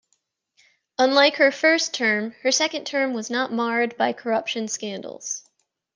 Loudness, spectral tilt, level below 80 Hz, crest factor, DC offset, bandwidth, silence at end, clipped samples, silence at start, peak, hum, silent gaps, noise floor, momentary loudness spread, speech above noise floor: -22 LUFS; -2 dB/octave; -78 dBFS; 20 dB; under 0.1%; 10 kHz; 0.55 s; under 0.1%; 1 s; -4 dBFS; none; none; -72 dBFS; 14 LU; 50 dB